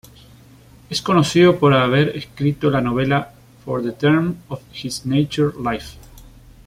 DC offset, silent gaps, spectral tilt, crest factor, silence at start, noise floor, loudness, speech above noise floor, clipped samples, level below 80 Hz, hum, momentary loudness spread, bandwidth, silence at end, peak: under 0.1%; none; -6 dB/octave; 16 dB; 0.9 s; -46 dBFS; -18 LUFS; 28 dB; under 0.1%; -48 dBFS; none; 16 LU; 15.5 kHz; 0.4 s; -2 dBFS